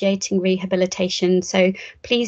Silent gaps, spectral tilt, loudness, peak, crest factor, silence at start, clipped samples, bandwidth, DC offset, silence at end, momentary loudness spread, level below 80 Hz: none; -4.5 dB/octave; -20 LUFS; -2 dBFS; 18 dB; 0 s; under 0.1%; 8 kHz; under 0.1%; 0 s; 3 LU; -58 dBFS